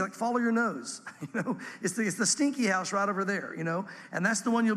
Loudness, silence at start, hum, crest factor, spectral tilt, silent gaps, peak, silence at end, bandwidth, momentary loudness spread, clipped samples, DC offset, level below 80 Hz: -29 LUFS; 0 s; none; 16 dB; -4 dB/octave; none; -12 dBFS; 0 s; 14 kHz; 10 LU; under 0.1%; under 0.1%; -82 dBFS